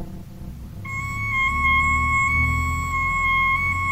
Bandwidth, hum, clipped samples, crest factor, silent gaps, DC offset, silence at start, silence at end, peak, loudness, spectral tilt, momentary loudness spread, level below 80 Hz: 16 kHz; none; under 0.1%; 14 dB; none; under 0.1%; 0 s; 0 s; -8 dBFS; -20 LUFS; -4 dB/octave; 20 LU; -32 dBFS